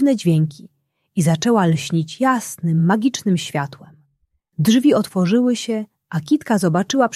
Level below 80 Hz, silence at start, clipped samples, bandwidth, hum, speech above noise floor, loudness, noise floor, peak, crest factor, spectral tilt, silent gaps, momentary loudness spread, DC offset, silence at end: -60 dBFS; 0 s; under 0.1%; 14.5 kHz; none; 50 dB; -18 LUFS; -67 dBFS; -2 dBFS; 16 dB; -6 dB/octave; none; 10 LU; under 0.1%; 0 s